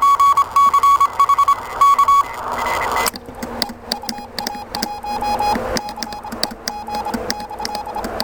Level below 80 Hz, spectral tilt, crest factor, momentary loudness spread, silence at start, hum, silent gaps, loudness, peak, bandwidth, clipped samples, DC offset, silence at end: -42 dBFS; -2.5 dB/octave; 18 dB; 13 LU; 0 s; none; none; -18 LUFS; 0 dBFS; 17.5 kHz; under 0.1%; under 0.1%; 0 s